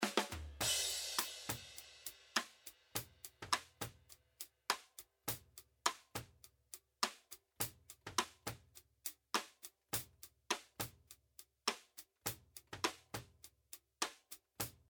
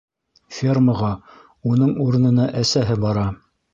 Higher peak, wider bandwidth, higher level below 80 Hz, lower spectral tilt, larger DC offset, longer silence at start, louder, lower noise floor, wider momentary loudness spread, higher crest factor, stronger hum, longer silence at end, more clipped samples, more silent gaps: second, -16 dBFS vs -6 dBFS; first, over 20 kHz vs 7.6 kHz; second, -68 dBFS vs -44 dBFS; second, -1.5 dB/octave vs -6.5 dB/octave; neither; second, 0 s vs 0.5 s; second, -43 LUFS vs -19 LUFS; first, -66 dBFS vs -41 dBFS; first, 18 LU vs 11 LU; first, 30 dB vs 14 dB; neither; second, 0.2 s vs 0.4 s; neither; neither